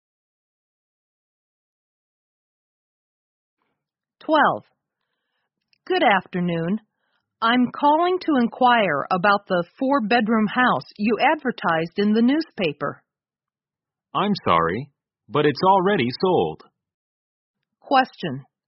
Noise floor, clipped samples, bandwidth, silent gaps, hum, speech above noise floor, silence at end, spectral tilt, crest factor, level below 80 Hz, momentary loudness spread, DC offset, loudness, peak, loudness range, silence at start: under -90 dBFS; under 0.1%; 5.8 kHz; 16.94-17.54 s; none; over 70 dB; 0.25 s; -3.5 dB/octave; 20 dB; -62 dBFS; 9 LU; under 0.1%; -21 LUFS; -4 dBFS; 7 LU; 4.3 s